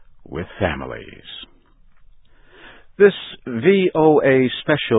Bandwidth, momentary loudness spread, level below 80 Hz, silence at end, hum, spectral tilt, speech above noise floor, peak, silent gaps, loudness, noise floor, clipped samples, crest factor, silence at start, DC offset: 4 kHz; 21 LU; -46 dBFS; 0 s; none; -11 dB/octave; 32 dB; 0 dBFS; none; -17 LUFS; -49 dBFS; under 0.1%; 18 dB; 0.3 s; under 0.1%